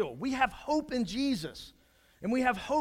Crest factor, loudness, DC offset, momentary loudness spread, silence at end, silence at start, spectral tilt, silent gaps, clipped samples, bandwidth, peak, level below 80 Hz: 20 dB; -31 LUFS; under 0.1%; 13 LU; 0 s; 0 s; -4.5 dB/octave; none; under 0.1%; 16 kHz; -12 dBFS; -56 dBFS